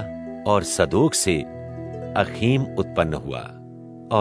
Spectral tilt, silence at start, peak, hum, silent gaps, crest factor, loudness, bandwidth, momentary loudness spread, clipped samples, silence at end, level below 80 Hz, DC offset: -5 dB/octave; 0 s; -2 dBFS; none; none; 20 dB; -22 LUFS; 11 kHz; 17 LU; under 0.1%; 0 s; -46 dBFS; under 0.1%